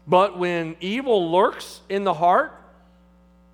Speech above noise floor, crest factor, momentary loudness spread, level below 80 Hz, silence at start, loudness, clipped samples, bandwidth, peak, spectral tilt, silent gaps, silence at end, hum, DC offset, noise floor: 33 dB; 20 dB; 9 LU; -58 dBFS; 0.05 s; -21 LUFS; under 0.1%; 16.5 kHz; -2 dBFS; -6 dB/octave; none; 1 s; none; under 0.1%; -54 dBFS